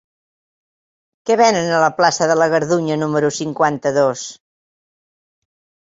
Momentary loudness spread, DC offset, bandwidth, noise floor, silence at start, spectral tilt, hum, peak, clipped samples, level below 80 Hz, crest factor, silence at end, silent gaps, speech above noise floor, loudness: 6 LU; under 0.1%; 8 kHz; under -90 dBFS; 1.25 s; -4.5 dB/octave; none; -2 dBFS; under 0.1%; -62 dBFS; 18 dB; 1.5 s; none; over 74 dB; -16 LUFS